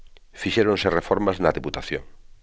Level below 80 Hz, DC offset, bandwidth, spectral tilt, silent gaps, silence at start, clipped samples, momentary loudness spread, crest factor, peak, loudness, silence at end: -44 dBFS; 0.1%; 8 kHz; -5.5 dB/octave; none; 0 s; under 0.1%; 11 LU; 20 dB; -4 dBFS; -23 LUFS; 0.3 s